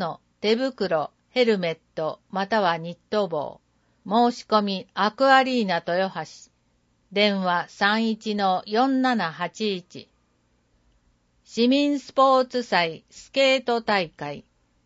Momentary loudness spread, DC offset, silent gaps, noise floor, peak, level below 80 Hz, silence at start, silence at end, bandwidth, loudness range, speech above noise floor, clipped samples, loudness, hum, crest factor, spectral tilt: 12 LU; under 0.1%; none; -67 dBFS; -6 dBFS; -68 dBFS; 0 s; 0.45 s; 8 kHz; 4 LU; 44 dB; under 0.1%; -23 LUFS; none; 20 dB; -5 dB/octave